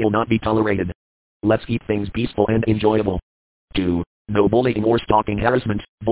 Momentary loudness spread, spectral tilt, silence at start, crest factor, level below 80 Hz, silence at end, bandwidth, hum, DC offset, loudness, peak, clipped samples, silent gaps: 8 LU; -11.5 dB/octave; 0 s; 18 dB; -40 dBFS; 0 s; 4 kHz; none; under 0.1%; -20 LUFS; -2 dBFS; under 0.1%; 0.95-1.40 s, 3.22-3.68 s, 4.07-4.25 s, 5.89-5.98 s